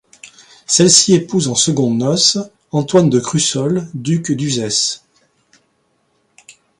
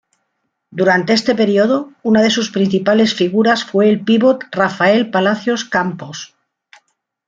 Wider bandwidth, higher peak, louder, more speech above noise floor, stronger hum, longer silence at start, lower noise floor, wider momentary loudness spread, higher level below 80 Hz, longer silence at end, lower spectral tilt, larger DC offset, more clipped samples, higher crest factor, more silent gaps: first, 11.5 kHz vs 7.6 kHz; about the same, 0 dBFS vs -2 dBFS; about the same, -14 LUFS vs -14 LUFS; second, 48 dB vs 57 dB; neither; second, 0.25 s vs 0.7 s; second, -62 dBFS vs -71 dBFS; first, 11 LU vs 7 LU; about the same, -56 dBFS vs -58 dBFS; second, 0.3 s vs 1 s; about the same, -4 dB/octave vs -5 dB/octave; neither; neither; about the same, 16 dB vs 14 dB; neither